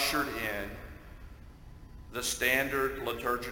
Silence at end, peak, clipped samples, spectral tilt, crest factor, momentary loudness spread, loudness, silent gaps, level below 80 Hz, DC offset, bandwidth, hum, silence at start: 0 s; -12 dBFS; under 0.1%; -2.5 dB/octave; 20 dB; 25 LU; -31 LUFS; none; -50 dBFS; under 0.1%; 17 kHz; none; 0 s